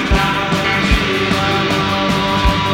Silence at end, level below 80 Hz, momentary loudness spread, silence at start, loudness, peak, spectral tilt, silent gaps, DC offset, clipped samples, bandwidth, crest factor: 0 s; -24 dBFS; 1 LU; 0 s; -15 LUFS; -2 dBFS; -5 dB/octave; none; under 0.1%; under 0.1%; 17 kHz; 12 dB